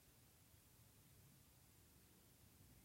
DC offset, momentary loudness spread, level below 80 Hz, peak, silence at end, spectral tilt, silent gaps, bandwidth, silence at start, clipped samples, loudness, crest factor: under 0.1%; 1 LU; -78 dBFS; -56 dBFS; 0 s; -3.5 dB/octave; none; 16 kHz; 0 s; under 0.1%; -69 LUFS; 14 dB